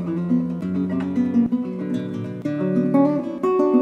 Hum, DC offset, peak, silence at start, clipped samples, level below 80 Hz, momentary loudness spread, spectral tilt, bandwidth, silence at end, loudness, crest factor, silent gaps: none; under 0.1%; -6 dBFS; 0 s; under 0.1%; -62 dBFS; 8 LU; -9.5 dB/octave; 7.2 kHz; 0 s; -22 LUFS; 16 dB; none